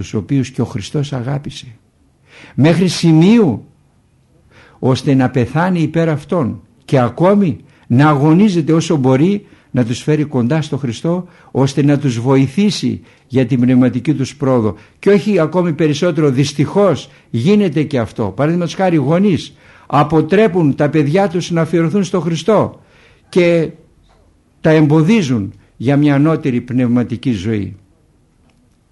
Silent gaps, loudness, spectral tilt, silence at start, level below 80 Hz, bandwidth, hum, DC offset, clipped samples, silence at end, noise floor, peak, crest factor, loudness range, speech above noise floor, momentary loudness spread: none; -14 LUFS; -7 dB/octave; 0 s; -50 dBFS; 11.5 kHz; none; under 0.1%; under 0.1%; 1.15 s; -53 dBFS; 0 dBFS; 14 dB; 3 LU; 40 dB; 10 LU